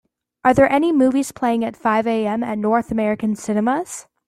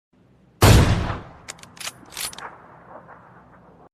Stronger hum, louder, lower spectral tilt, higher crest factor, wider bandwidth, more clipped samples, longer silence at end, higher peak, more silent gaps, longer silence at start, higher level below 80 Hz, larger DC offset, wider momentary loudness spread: neither; about the same, -19 LUFS vs -20 LUFS; about the same, -5.5 dB/octave vs -5 dB/octave; about the same, 16 dB vs 20 dB; about the same, 14.5 kHz vs 14.5 kHz; neither; second, 0.25 s vs 1.45 s; about the same, -2 dBFS vs -2 dBFS; neither; second, 0.45 s vs 0.6 s; second, -50 dBFS vs -30 dBFS; neither; second, 7 LU vs 24 LU